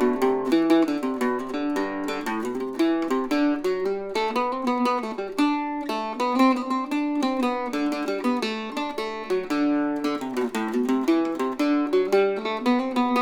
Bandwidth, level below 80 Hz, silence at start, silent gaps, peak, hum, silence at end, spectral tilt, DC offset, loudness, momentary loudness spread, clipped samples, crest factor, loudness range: 17.5 kHz; -60 dBFS; 0 s; none; -8 dBFS; none; 0 s; -4.5 dB/octave; under 0.1%; -24 LUFS; 7 LU; under 0.1%; 16 dB; 2 LU